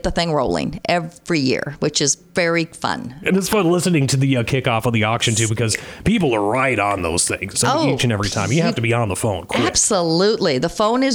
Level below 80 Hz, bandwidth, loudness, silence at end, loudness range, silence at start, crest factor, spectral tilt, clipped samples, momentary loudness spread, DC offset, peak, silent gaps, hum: -42 dBFS; 20 kHz; -18 LUFS; 0 s; 1 LU; 0.05 s; 16 dB; -4 dB/octave; under 0.1%; 5 LU; under 0.1%; -2 dBFS; none; none